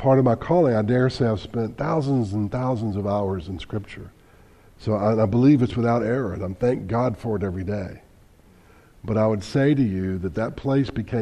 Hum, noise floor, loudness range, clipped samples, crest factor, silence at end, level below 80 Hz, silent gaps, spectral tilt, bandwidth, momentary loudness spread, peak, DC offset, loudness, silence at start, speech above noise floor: none; -52 dBFS; 4 LU; under 0.1%; 16 dB; 0 s; -46 dBFS; none; -8.5 dB/octave; 10.5 kHz; 12 LU; -6 dBFS; under 0.1%; -23 LUFS; 0 s; 30 dB